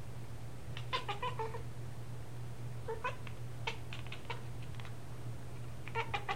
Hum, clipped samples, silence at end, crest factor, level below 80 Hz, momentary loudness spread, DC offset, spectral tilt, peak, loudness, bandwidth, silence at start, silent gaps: none; under 0.1%; 0 s; 22 dB; -58 dBFS; 9 LU; 0.7%; -5 dB/octave; -20 dBFS; -44 LUFS; 16.5 kHz; 0 s; none